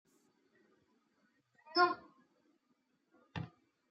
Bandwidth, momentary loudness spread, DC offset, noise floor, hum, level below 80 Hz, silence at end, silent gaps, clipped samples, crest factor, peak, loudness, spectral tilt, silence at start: 7.4 kHz; 18 LU; under 0.1%; -79 dBFS; none; -84 dBFS; 0.45 s; none; under 0.1%; 24 dB; -18 dBFS; -34 LUFS; -6.5 dB/octave; 1.7 s